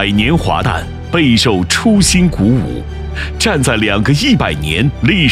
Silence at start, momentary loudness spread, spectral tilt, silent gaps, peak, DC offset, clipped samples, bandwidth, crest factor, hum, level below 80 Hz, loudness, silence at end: 0 s; 11 LU; -4.5 dB/octave; none; 0 dBFS; under 0.1%; under 0.1%; 15.5 kHz; 12 dB; none; -26 dBFS; -12 LUFS; 0 s